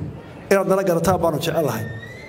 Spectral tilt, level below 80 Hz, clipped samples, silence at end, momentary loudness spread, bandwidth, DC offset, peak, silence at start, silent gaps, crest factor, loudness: -5.5 dB/octave; -46 dBFS; under 0.1%; 0 s; 14 LU; 16.5 kHz; under 0.1%; -2 dBFS; 0 s; none; 18 dB; -20 LUFS